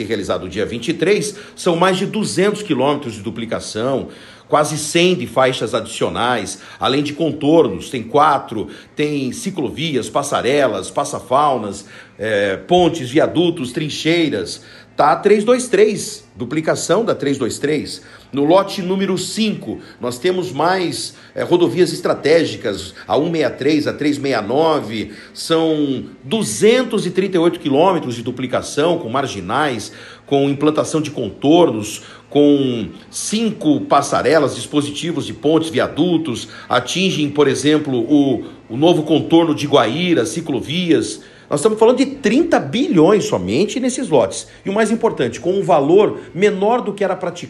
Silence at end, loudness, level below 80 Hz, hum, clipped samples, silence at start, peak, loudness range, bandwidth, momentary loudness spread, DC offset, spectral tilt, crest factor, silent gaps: 0 s; -17 LUFS; -54 dBFS; none; under 0.1%; 0 s; 0 dBFS; 3 LU; 12.5 kHz; 11 LU; under 0.1%; -5 dB/octave; 16 dB; none